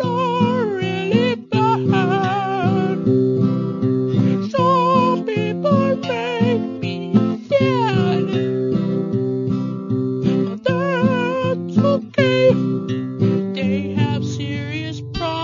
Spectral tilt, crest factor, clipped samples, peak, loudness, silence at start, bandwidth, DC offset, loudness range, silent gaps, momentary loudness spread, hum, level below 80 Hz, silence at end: -7.5 dB/octave; 16 dB; under 0.1%; -2 dBFS; -19 LUFS; 0 s; 7.4 kHz; under 0.1%; 2 LU; none; 7 LU; none; -52 dBFS; 0 s